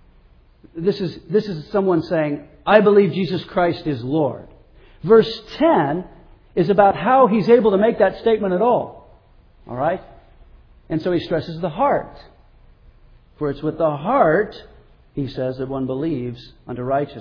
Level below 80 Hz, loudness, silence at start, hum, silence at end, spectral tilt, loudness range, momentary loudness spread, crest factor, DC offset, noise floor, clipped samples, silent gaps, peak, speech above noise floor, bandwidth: -48 dBFS; -19 LUFS; 0.75 s; none; 0 s; -8.5 dB/octave; 8 LU; 14 LU; 20 dB; under 0.1%; -51 dBFS; under 0.1%; none; 0 dBFS; 33 dB; 5.4 kHz